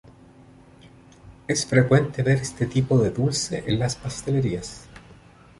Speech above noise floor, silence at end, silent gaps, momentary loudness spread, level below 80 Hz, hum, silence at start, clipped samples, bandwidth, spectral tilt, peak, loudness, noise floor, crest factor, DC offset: 28 dB; 0.45 s; none; 11 LU; -48 dBFS; none; 1.25 s; under 0.1%; 11.5 kHz; -5.5 dB/octave; -4 dBFS; -23 LUFS; -50 dBFS; 20 dB; under 0.1%